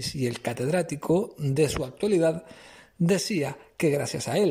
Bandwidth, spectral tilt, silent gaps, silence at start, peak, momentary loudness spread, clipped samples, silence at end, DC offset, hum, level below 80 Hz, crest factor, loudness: 16 kHz; -5.5 dB/octave; none; 0 s; -12 dBFS; 6 LU; under 0.1%; 0 s; under 0.1%; none; -52 dBFS; 14 dB; -26 LUFS